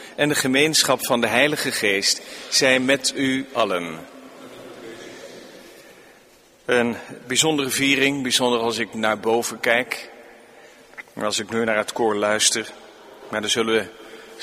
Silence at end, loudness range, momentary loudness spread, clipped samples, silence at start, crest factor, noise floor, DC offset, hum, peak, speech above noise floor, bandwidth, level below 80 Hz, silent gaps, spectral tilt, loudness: 0 s; 10 LU; 21 LU; under 0.1%; 0 s; 22 dB; -52 dBFS; under 0.1%; none; -2 dBFS; 31 dB; 15.5 kHz; -62 dBFS; none; -2 dB/octave; -20 LUFS